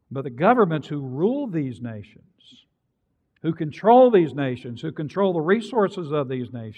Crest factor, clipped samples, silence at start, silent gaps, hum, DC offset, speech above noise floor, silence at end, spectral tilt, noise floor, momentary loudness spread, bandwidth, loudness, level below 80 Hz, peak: 20 dB; under 0.1%; 0.1 s; none; none; under 0.1%; 51 dB; 0.05 s; -8.5 dB/octave; -73 dBFS; 15 LU; 9 kHz; -22 LUFS; -70 dBFS; -4 dBFS